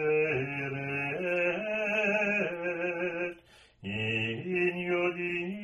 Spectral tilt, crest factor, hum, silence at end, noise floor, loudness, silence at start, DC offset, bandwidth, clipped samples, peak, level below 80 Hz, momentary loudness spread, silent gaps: -6.5 dB/octave; 14 dB; none; 0 s; -57 dBFS; -30 LUFS; 0 s; under 0.1%; 10.5 kHz; under 0.1%; -16 dBFS; -66 dBFS; 6 LU; none